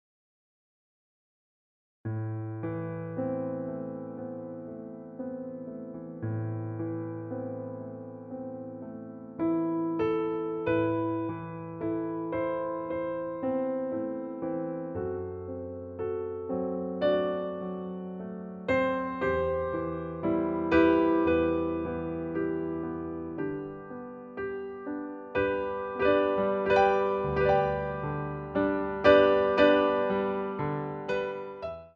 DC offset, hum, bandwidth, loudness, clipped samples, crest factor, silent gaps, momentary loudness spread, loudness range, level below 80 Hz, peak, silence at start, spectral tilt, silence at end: under 0.1%; none; 7 kHz; -30 LUFS; under 0.1%; 24 dB; none; 16 LU; 12 LU; -54 dBFS; -6 dBFS; 2.05 s; -8.5 dB/octave; 0.05 s